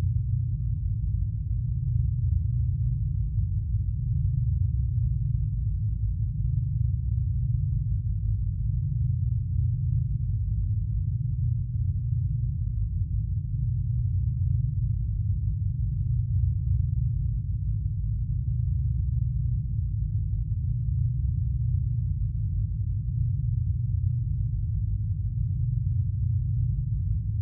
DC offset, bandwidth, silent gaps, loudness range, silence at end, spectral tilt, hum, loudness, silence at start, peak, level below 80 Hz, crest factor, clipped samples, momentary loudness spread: under 0.1%; 0.4 kHz; none; 1 LU; 0 s; -15.5 dB/octave; none; -28 LUFS; 0 s; -14 dBFS; -32 dBFS; 12 dB; under 0.1%; 3 LU